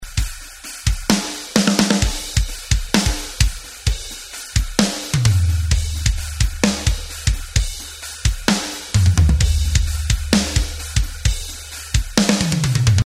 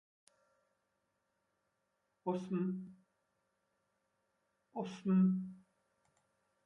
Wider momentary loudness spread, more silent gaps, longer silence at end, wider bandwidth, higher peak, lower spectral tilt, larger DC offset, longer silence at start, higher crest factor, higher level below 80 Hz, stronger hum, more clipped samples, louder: second, 9 LU vs 18 LU; neither; second, 0 s vs 1.05 s; first, 16 kHz vs 6.8 kHz; first, 0 dBFS vs -24 dBFS; second, -4 dB/octave vs -9 dB/octave; neither; second, 0 s vs 2.25 s; about the same, 18 dB vs 18 dB; first, -24 dBFS vs -82 dBFS; neither; neither; first, -19 LUFS vs -37 LUFS